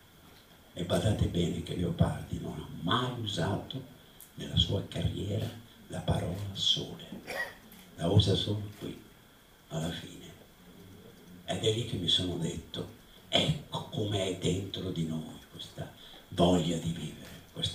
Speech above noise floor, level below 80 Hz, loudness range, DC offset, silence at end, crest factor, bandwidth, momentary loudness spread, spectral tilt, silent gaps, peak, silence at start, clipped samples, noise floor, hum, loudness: 27 dB; -50 dBFS; 3 LU; under 0.1%; 0 s; 24 dB; 15.5 kHz; 20 LU; -5.5 dB/octave; none; -10 dBFS; 0.25 s; under 0.1%; -58 dBFS; none; -32 LUFS